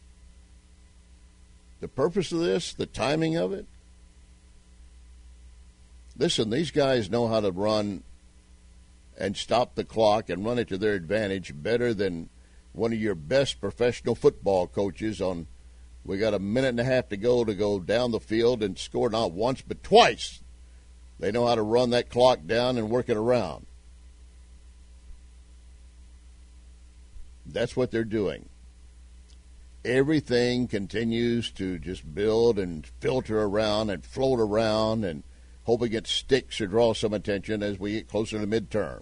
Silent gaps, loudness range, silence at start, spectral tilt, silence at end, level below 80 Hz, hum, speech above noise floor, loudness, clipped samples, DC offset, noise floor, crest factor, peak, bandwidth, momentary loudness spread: none; 8 LU; 1.8 s; -5.5 dB/octave; 0 s; -48 dBFS; none; 28 dB; -26 LUFS; under 0.1%; under 0.1%; -54 dBFS; 22 dB; -6 dBFS; 10.5 kHz; 10 LU